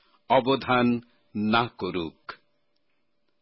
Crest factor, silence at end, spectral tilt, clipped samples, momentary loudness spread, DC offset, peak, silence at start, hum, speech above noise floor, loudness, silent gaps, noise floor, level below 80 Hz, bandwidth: 18 dB; 1.05 s; -10 dB/octave; under 0.1%; 15 LU; under 0.1%; -10 dBFS; 0.3 s; none; 52 dB; -25 LUFS; none; -77 dBFS; -58 dBFS; 5.8 kHz